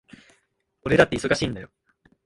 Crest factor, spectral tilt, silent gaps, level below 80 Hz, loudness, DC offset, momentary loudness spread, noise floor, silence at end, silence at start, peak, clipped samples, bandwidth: 24 dB; -5 dB/octave; none; -48 dBFS; -22 LUFS; under 0.1%; 16 LU; -69 dBFS; 0.6 s; 0.85 s; 0 dBFS; under 0.1%; 11.5 kHz